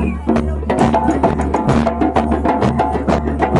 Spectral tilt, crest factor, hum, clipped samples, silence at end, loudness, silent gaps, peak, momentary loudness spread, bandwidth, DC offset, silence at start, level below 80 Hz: -7.5 dB/octave; 14 dB; none; under 0.1%; 0 s; -16 LUFS; none; -2 dBFS; 3 LU; 11.5 kHz; under 0.1%; 0 s; -24 dBFS